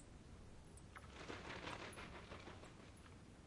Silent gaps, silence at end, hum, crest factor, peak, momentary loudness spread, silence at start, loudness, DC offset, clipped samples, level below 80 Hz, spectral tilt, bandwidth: none; 0 s; none; 20 dB; -34 dBFS; 11 LU; 0 s; -55 LUFS; under 0.1%; under 0.1%; -66 dBFS; -4.5 dB/octave; 11.5 kHz